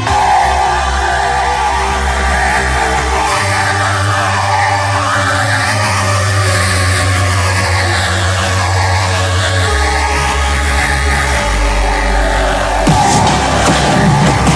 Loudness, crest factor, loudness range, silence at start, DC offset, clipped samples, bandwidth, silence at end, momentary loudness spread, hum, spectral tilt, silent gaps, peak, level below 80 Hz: -12 LUFS; 10 dB; 1 LU; 0 s; under 0.1%; under 0.1%; 11 kHz; 0 s; 3 LU; none; -4 dB/octave; none; -2 dBFS; -20 dBFS